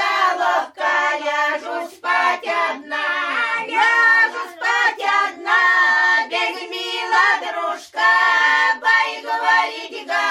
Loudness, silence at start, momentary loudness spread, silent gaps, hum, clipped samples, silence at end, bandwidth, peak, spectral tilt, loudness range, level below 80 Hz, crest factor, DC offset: -17 LUFS; 0 s; 10 LU; none; none; under 0.1%; 0 s; 14 kHz; -4 dBFS; 0 dB/octave; 4 LU; -70 dBFS; 14 dB; under 0.1%